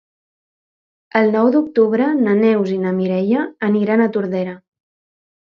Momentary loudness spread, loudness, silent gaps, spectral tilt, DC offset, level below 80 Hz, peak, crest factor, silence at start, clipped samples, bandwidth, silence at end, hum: 7 LU; -17 LUFS; none; -9 dB/octave; under 0.1%; -66 dBFS; 0 dBFS; 18 dB; 1.15 s; under 0.1%; 6 kHz; 0.9 s; none